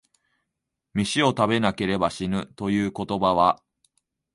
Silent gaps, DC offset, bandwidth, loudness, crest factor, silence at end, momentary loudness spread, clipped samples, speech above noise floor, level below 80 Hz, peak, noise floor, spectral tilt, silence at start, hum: none; under 0.1%; 11.5 kHz; -24 LUFS; 20 dB; 0.8 s; 8 LU; under 0.1%; 60 dB; -52 dBFS; -4 dBFS; -82 dBFS; -5.5 dB/octave; 0.95 s; none